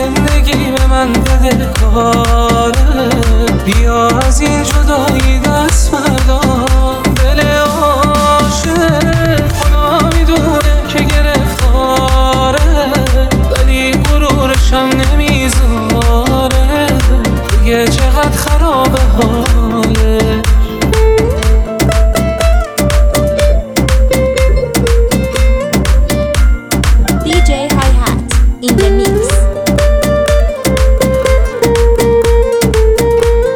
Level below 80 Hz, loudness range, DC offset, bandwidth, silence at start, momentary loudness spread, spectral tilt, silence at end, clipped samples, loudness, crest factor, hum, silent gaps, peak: -12 dBFS; 1 LU; under 0.1%; 18 kHz; 0 s; 2 LU; -5.5 dB/octave; 0 s; under 0.1%; -11 LUFS; 8 dB; none; none; 0 dBFS